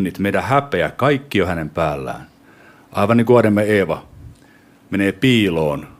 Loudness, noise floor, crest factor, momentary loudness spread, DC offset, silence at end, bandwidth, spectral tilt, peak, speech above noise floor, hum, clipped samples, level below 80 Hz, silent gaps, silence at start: -17 LUFS; -49 dBFS; 18 dB; 13 LU; under 0.1%; 0.15 s; 15.5 kHz; -6.5 dB/octave; 0 dBFS; 32 dB; none; under 0.1%; -46 dBFS; none; 0 s